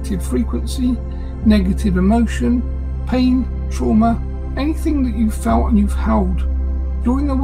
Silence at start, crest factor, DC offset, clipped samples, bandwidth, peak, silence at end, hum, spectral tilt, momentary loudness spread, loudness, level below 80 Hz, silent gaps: 0 s; 14 dB; under 0.1%; under 0.1%; 13 kHz; -2 dBFS; 0 s; none; -7.5 dB/octave; 7 LU; -18 LUFS; -20 dBFS; none